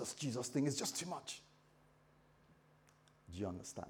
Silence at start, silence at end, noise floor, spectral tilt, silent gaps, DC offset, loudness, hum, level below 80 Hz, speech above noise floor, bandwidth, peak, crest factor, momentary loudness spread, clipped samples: 0 s; 0 s; -70 dBFS; -4 dB/octave; none; under 0.1%; -42 LUFS; none; -76 dBFS; 27 dB; over 20 kHz; -26 dBFS; 20 dB; 13 LU; under 0.1%